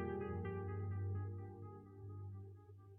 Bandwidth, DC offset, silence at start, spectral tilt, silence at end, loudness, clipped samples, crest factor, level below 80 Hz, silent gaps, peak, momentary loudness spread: 3.3 kHz; under 0.1%; 0 s; -7 dB/octave; 0 s; -47 LUFS; under 0.1%; 14 dB; -66 dBFS; none; -32 dBFS; 12 LU